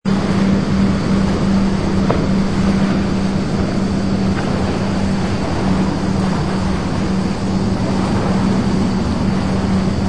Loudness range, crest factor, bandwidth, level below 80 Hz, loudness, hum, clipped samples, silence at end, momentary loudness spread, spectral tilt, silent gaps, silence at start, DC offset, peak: 2 LU; 16 dB; 10 kHz; -30 dBFS; -17 LUFS; none; under 0.1%; 0 s; 3 LU; -7 dB/octave; none; 0 s; 3%; 0 dBFS